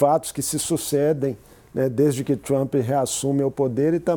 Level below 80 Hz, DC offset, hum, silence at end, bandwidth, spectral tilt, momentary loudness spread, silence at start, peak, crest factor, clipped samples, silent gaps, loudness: -56 dBFS; under 0.1%; none; 0 s; 19.5 kHz; -5.5 dB/octave; 5 LU; 0 s; -4 dBFS; 16 dB; under 0.1%; none; -22 LUFS